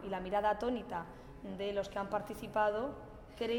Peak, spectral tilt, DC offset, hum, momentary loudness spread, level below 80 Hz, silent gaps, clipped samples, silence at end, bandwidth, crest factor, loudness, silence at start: -20 dBFS; -5.5 dB/octave; under 0.1%; none; 16 LU; -58 dBFS; none; under 0.1%; 0 s; 16 kHz; 18 dB; -37 LUFS; 0 s